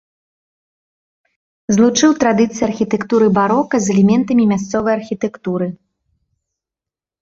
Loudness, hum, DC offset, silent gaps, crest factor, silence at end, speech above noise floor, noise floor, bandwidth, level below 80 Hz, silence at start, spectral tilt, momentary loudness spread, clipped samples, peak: -15 LUFS; none; under 0.1%; none; 16 dB; 1.45 s; 73 dB; -88 dBFS; 7.8 kHz; -52 dBFS; 1.7 s; -5.5 dB/octave; 9 LU; under 0.1%; -2 dBFS